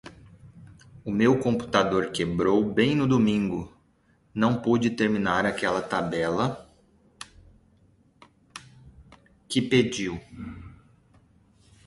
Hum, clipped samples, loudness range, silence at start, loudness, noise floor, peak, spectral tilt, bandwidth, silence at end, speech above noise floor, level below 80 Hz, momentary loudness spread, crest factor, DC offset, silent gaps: none; under 0.1%; 8 LU; 0.05 s; -25 LUFS; -64 dBFS; -6 dBFS; -6 dB/octave; 11.5 kHz; 1.1 s; 40 dB; -54 dBFS; 23 LU; 22 dB; under 0.1%; none